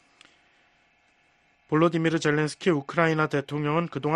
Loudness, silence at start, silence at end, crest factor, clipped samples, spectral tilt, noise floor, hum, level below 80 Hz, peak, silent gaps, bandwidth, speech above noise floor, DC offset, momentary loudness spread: -25 LUFS; 1.7 s; 0 s; 20 dB; under 0.1%; -6.5 dB/octave; -65 dBFS; none; -64 dBFS; -6 dBFS; none; 11 kHz; 40 dB; under 0.1%; 4 LU